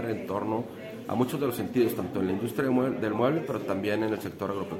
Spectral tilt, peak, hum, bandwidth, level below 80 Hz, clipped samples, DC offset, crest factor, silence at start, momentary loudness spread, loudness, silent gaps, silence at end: -7 dB/octave; -12 dBFS; none; 16 kHz; -66 dBFS; under 0.1%; under 0.1%; 18 dB; 0 s; 7 LU; -29 LUFS; none; 0 s